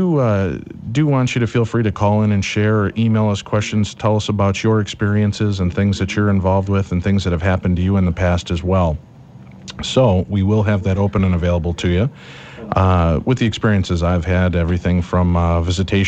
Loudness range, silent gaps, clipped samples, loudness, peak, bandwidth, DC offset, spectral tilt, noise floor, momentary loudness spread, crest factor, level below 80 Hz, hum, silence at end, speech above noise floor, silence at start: 1 LU; none; under 0.1%; -17 LUFS; -2 dBFS; 8.4 kHz; under 0.1%; -7 dB/octave; -39 dBFS; 4 LU; 14 dB; -34 dBFS; none; 0 s; 23 dB; 0 s